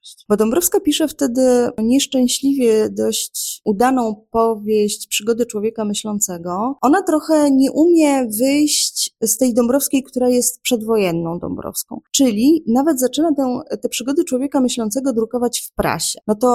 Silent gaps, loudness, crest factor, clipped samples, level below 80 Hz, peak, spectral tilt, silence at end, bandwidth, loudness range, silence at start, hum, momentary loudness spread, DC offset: none; -17 LUFS; 14 dB; under 0.1%; -50 dBFS; -2 dBFS; -3.5 dB/octave; 0 s; 16.5 kHz; 4 LU; 0.05 s; none; 7 LU; under 0.1%